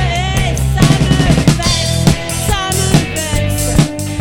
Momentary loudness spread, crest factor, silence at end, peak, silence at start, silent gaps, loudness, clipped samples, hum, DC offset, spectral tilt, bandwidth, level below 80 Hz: 5 LU; 12 dB; 0 s; 0 dBFS; 0 s; none; -13 LUFS; 0.2%; none; under 0.1%; -4.5 dB/octave; 17.5 kHz; -22 dBFS